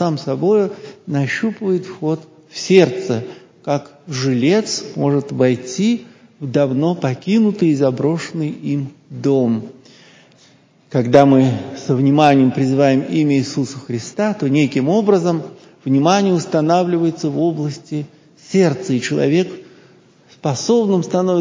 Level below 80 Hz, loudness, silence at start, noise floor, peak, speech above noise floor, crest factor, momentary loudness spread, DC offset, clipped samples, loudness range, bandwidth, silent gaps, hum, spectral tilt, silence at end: -62 dBFS; -17 LUFS; 0 s; -51 dBFS; 0 dBFS; 35 dB; 16 dB; 12 LU; under 0.1%; under 0.1%; 4 LU; 8 kHz; none; none; -6.5 dB/octave; 0 s